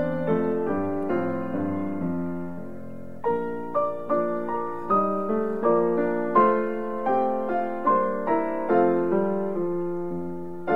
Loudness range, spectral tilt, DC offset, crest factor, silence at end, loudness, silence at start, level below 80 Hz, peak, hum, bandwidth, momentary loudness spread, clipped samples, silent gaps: 5 LU; -9.5 dB/octave; 1%; 18 dB; 0 s; -25 LUFS; 0 s; -60 dBFS; -6 dBFS; none; 4.8 kHz; 10 LU; under 0.1%; none